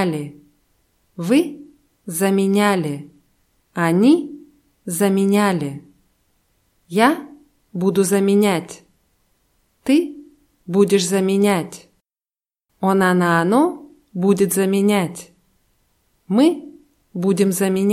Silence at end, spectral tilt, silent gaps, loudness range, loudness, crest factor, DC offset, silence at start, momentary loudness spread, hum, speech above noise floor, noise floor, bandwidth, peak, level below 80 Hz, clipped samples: 0 s; -5.5 dB/octave; none; 3 LU; -18 LUFS; 18 dB; under 0.1%; 0 s; 17 LU; none; over 73 dB; under -90 dBFS; 16 kHz; 0 dBFS; -64 dBFS; under 0.1%